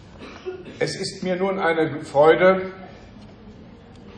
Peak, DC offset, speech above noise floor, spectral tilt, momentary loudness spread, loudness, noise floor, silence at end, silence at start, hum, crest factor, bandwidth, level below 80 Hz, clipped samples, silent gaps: -2 dBFS; under 0.1%; 24 dB; -5.5 dB/octave; 22 LU; -20 LUFS; -44 dBFS; 0 s; 0.15 s; none; 20 dB; 10 kHz; -54 dBFS; under 0.1%; none